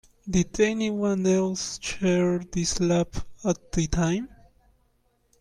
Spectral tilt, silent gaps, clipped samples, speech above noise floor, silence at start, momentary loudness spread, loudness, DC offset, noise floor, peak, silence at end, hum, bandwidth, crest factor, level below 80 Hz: -5 dB/octave; none; under 0.1%; 43 dB; 0.25 s; 7 LU; -26 LUFS; under 0.1%; -67 dBFS; -8 dBFS; 1.15 s; none; 11.5 kHz; 18 dB; -42 dBFS